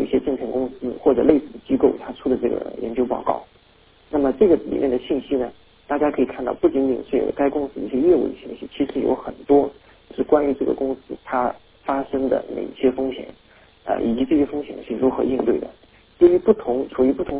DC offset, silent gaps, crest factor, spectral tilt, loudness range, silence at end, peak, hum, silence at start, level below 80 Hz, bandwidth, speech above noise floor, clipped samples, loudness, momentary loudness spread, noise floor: under 0.1%; none; 20 dB; -11 dB/octave; 3 LU; 0 s; -2 dBFS; none; 0 s; -48 dBFS; 4 kHz; 34 dB; under 0.1%; -21 LUFS; 10 LU; -54 dBFS